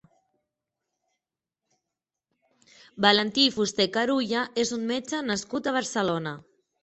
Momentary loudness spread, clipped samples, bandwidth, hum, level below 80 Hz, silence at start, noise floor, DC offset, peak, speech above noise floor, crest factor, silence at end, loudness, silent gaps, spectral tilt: 9 LU; under 0.1%; 8.6 kHz; none; -68 dBFS; 2.95 s; -88 dBFS; under 0.1%; -4 dBFS; 62 dB; 24 dB; 0.4 s; -25 LUFS; none; -3 dB/octave